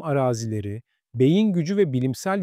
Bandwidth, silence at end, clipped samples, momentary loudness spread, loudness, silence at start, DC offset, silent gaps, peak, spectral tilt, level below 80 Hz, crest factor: 15.5 kHz; 0 s; under 0.1%; 15 LU; -22 LUFS; 0 s; under 0.1%; none; -8 dBFS; -7 dB/octave; -62 dBFS; 14 dB